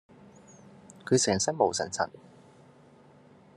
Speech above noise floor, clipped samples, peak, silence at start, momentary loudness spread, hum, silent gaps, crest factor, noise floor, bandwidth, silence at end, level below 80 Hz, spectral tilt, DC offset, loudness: 29 dB; under 0.1%; -8 dBFS; 0.9 s; 9 LU; none; none; 24 dB; -56 dBFS; 12 kHz; 1.5 s; -72 dBFS; -3.5 dB/octave; under 0.1%; -27 LUFS